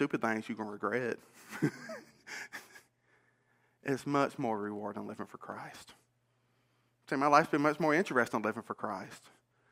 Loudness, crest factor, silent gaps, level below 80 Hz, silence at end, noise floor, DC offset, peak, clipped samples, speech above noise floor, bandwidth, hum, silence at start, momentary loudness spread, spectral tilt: -33 LUFS; 28 dB; none; -82 dBFS; 0.55 s; -75 dBFS; under 0.1%; -8 dBFS; under 0.1%; 41 dB; 16 kHz; none; 0 s; 19 LU; -5.5 dB/octave